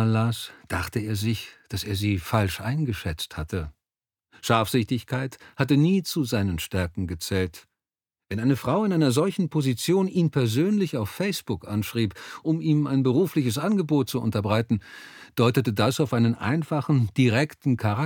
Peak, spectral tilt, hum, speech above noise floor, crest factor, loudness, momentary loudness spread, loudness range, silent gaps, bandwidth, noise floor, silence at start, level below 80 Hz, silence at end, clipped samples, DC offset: -4 dBFS; -6 dB/octave; none; over 66 dB; 20 dB; -25 LUFS; 10 LU; 4 LU; none; 19 kHz; under -90 dBFS; 0 s; -50 dBFS; 0 s; under 0.1%; under 0.1%